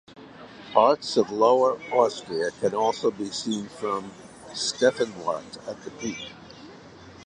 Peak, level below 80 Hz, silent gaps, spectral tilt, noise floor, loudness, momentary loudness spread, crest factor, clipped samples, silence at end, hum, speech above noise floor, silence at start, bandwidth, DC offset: -4 dBFS; -64 dBFS; none; -3.5 dB/octave; -46 dBFS; -25 LUFS; 24 LU; 22 dB; under 0.1%; 0 s; none; 22 dB; 0.1 s; 10.5 kHz; under 0.1%